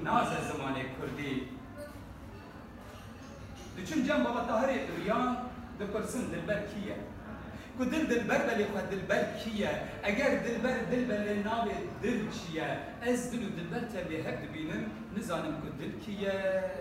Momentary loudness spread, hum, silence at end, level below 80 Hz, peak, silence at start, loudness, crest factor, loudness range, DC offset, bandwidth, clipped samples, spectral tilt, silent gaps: 16 LU; none; 0 s; -54 dBFS; -14 dBFS; 0 s; -34 LUFS; 20 dB; 5 LU; under 0.1%; 16 kHz; under 0.1%; -5.5 dB/octave; none